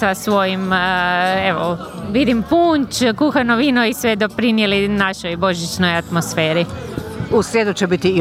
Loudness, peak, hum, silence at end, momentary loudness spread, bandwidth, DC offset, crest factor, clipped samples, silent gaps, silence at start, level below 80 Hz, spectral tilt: -17 LUFS; -2 dBFS; none; 0 s; 5 LU; 16.5 kHz; under 0.1%; 14 dB; under 0.1%; none; 0 s; -44 dBFS; -5 dB/octave